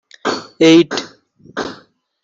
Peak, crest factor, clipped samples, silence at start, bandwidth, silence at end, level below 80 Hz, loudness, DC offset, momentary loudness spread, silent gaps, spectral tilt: 0 dBFS; 16 dB; under 0.1%; 0.25 s; 7.6 kHz; 0.5 s; -62 dBFS; -15 LUFS; under 0.1%; 19 LU; none; -4.5 dB/octave